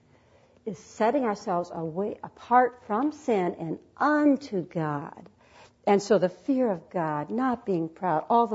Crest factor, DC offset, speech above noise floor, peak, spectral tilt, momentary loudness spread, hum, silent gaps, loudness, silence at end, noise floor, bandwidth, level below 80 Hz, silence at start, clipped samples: 18 dB; under 0.1%; 33 dB; -8 dBFS; -6.5 dB/octave; 13 LU; none; none; -27 LUFS; 0 s; -60 dBFS; 8 kHz; -68 dBFS; 0.65 s; under 0.1%